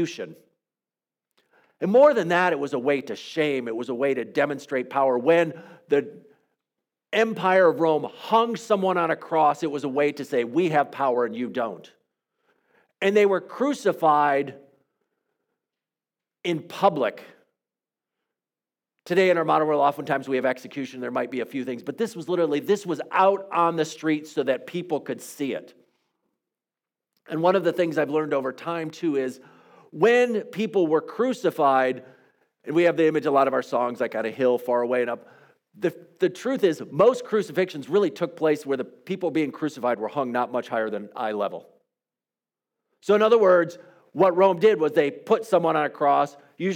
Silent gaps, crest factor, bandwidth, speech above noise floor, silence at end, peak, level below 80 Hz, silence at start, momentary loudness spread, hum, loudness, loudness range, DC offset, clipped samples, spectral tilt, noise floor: none; 18 dB; 17 kHz; over 67 dB; 0 s; -6 dBFS; -82 dBFS; 0 s; 11 LU; none; -23 LUFS; 6 LU; under 0.1%; under 0.1%; -6 dB/octave; under -90 dBFS